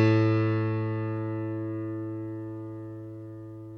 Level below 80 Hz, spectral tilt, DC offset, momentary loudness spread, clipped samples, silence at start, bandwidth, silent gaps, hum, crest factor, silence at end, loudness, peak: -66 dBFS; -9.5 dB/octave; under 0.1%; 17 LU; under 0.1%; 0 s; 6.2 kHz; none; none; 18 dB; 0 s; -30 LUFS; -12 dBFS